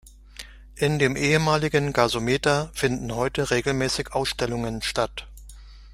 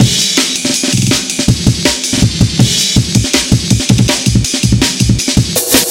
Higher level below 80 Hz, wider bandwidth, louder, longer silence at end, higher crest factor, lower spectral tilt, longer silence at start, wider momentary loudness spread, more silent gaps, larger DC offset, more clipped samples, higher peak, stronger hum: second, -44 dBFS vs -24 dBFS; about the same, 16 kHz vs 17 kHz; second, -24 LUFS vs -10 LUFS; about the same, 0 s vs 0 s; first, 22 dB vs 10 dB; about the same, -4.5 dB/octave vs -3.5 dB/octave; about the same, 0.05 s vs 0 s; first, 17 LU vs 2 LU; neither; second, under 0.1% vs 0.2%; second, under 0.1% vs 0.6%; second, -4 dBFS vs 0 dBFS; neither